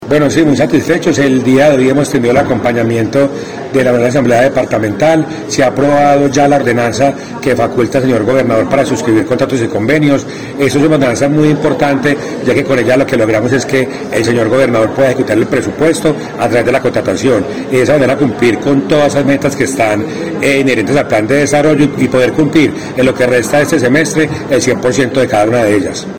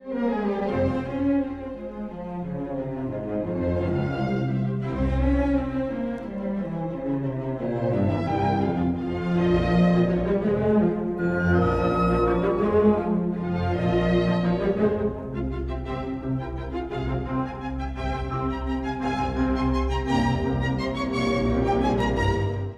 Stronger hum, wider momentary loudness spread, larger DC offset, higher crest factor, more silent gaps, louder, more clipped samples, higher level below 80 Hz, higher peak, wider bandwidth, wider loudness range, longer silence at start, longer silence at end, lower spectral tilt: neither; second, 5 LU vs 9 LU; first, 0.8% vs under 0.1%; second, 10 dB vs 16 dB; neither; first, -11 LUFS vs -25 LUFS; first, 0.2% vs under 0.1%; second, -42 dBFS vs -36 dBFS; first, 0 dBFS vs -8 dBFS; first, over 20 kHz vs 9 kHz; second, 1 LU vs 6 LU; about the same, 0 s vs 0 s; about the same, 0 s vs 0 s; second, -5.5 dB/octave vs -8.5 dB/octave